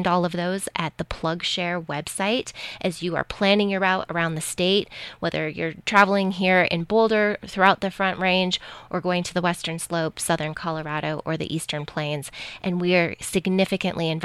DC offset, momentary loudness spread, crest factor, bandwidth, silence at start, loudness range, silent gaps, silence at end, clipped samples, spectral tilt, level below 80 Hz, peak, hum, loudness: under 0.1%; 9 LU; 22 dB; 14.5 kHz; 0 s; 6 LU; none; 0 s; under 0.1%; -4.5 dB/octave; -52 dBFS; -2 dBFS; none; -23 LUFS